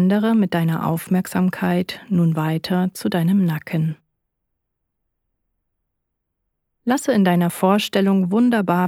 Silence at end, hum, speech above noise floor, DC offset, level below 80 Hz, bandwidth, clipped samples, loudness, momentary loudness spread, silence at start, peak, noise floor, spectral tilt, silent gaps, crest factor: 0 s; none; 59 dB; under 0.1%; -62 dBFS; 16.5 kHz; under 0.1%; -19 LUFS; 6 LU; 0 s; -4 dBFS; -77 dBFS; -6.5 dB/octave; none; 16 dB